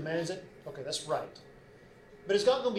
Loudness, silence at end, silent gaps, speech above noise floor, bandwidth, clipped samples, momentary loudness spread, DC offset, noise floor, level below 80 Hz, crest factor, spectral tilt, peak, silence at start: -33 LUFS; 0 s; none; 24 dB; 14 kHz; under 0.1%; 20 LU; under 0.1%; -56 dBFS; -66 dBFS; 20 dB; -4 dB/octave; -14 dBFS; 0 s